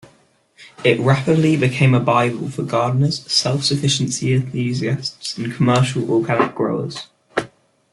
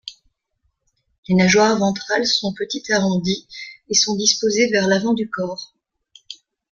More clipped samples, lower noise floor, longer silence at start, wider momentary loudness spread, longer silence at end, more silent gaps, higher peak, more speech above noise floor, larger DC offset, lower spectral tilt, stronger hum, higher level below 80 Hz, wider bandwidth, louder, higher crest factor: neither; second, -56 dBFS vs -70 dBFS; first, 0.6 s vs 0.05 s; second, 10 LU vs 20 LU; about the same, 0.45 s vs 0.4 s; second, none vs 1.18-1.23 s; about the same, -2 dBFS vs -2 dBFS; second, 38 dB vs 52 dB; neither; first, -5.5 dB/octave vs -3.5 dB/octave; neither; about the same, -56 dBFS vs -56 dBFS; first, 11.5 kHz vs 7.4 kHz; about the same, -18 LUFS vs -18 LUFS; about the same, 18 dB vs 18 dB